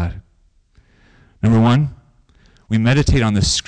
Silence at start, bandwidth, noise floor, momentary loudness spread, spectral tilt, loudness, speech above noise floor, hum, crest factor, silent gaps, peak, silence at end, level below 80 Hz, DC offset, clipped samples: 0 s; 10 kHz; -56 dBFS; 12 LU; -5.5 dB/octave; -16 LUFS; 42 dB; none; 10 dB; none; -8 dBFS; 0.05 s; -30 dBFS; under 0.1%; under 0.1%